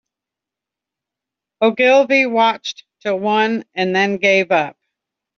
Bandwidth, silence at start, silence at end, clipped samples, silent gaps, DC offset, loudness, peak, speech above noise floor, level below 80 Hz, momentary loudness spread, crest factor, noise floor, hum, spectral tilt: 7.2 kHz; 1.6 s; 0.65 s; under 0.1%; none; under 0.1%; -16 LUFS; -2 dBFS; 70 dB; -68 dBFS; 13 LU; 16 dB; -86 dBFS; none; -2 dB/octave